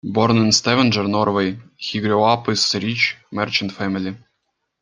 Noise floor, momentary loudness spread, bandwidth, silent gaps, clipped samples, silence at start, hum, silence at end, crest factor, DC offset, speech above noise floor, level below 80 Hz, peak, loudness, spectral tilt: -73 dBFS; 10 LU; 9.8 kHz; none; under 0.1%; 0.05 s; none; 0.65 s; 18 dB; under 0.1%; 55 dB; -58 dBFS; -2 dBFS; -18 LUFS; -4 dB/octave